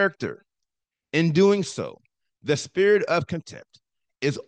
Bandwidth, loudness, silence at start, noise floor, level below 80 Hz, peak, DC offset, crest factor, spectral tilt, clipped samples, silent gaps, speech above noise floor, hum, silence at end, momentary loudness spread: 9.4 kHz; -23 LUFS; 0 s; -85 dBFS; -70 dBFS; -8 dBFS; under 0.1%; 16 dB; -5.5 dB/octave; under 0.1%; none; 62 dB; none; 0.05 s; 15 LU